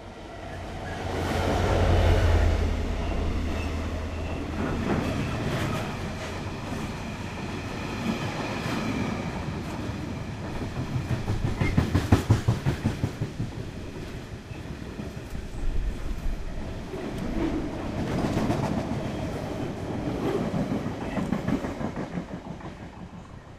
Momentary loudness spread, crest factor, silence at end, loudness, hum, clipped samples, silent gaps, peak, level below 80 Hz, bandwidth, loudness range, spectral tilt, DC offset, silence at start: 13 LU; 22 dB; 0 s; -30 LUFS; none; under 0.1%; none; -6 dBFS; -34 dBFS; 15 kHz; 7 LU; -6.5 dB/octave; under 0.1%; 0 s